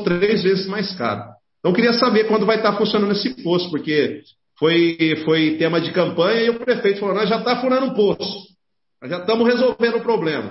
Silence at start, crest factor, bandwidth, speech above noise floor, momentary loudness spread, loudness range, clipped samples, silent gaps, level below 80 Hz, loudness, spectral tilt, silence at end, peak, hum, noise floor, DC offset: 0 s; 16 dB; 6 kHz; 49 dB; 8 LU; 2 LU; under 0.1%; none; -60 dBFS; -18 LUFS; -8.5 dB/octave; 0 s; -2 dBFS; none; -67 dBFS; under 0.1%